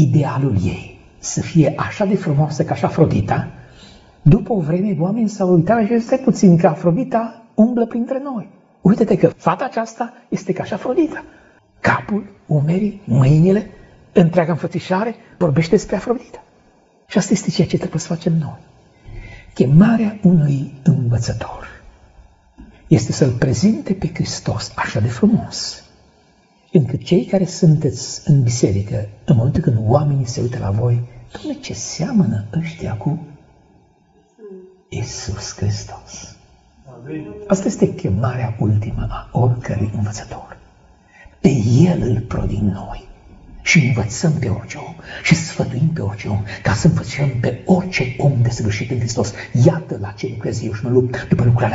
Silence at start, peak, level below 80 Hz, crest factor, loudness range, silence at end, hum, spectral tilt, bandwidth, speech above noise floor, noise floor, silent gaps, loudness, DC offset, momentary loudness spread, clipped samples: 0 s; 0 dBFS; -40 dBFS; 18 dB; 6 LU; 0 s; none; -7 dB/octave; 8 kHz; 38 dB; -55 dBFS; none; -18 LUFS; under 0.1%; 13 LU; under 0.1%